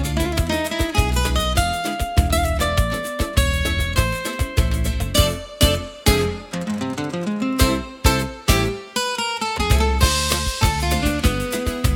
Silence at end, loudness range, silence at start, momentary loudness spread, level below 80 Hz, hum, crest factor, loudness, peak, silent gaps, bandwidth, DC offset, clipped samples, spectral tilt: 0 s; 1 LU; 0 s; 5 LU; -24 dBFS; none; 20 dB; -20 LUFS; 0 dBFS; none; 18 kHz; under 0.1%; under 0.1%; -4.5 dB/octave